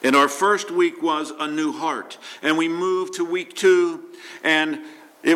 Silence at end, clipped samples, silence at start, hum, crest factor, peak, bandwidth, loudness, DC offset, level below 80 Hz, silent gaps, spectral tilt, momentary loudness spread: 0 s; under 0.1%; 0 s; none; 16 dB; -6 dBFS; 15.5 kHz; -21 LUFS; under 0.1%; -76 dBFS; none; -3 dB/octave; 10 LU